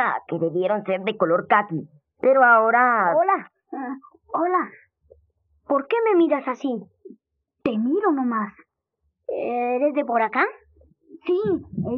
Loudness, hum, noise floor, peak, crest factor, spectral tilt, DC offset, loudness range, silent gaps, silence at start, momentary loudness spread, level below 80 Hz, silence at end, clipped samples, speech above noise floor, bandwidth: -21 LUFS; none; -75 dBFS; -4 dBFS; 18 dB; -4.5 dB/octave; under 0.1%; 6 LU; none; 0 s; 15 LU; -68 dBFS; 0 s; under 0.1%; 54 dB; 6.4 kHz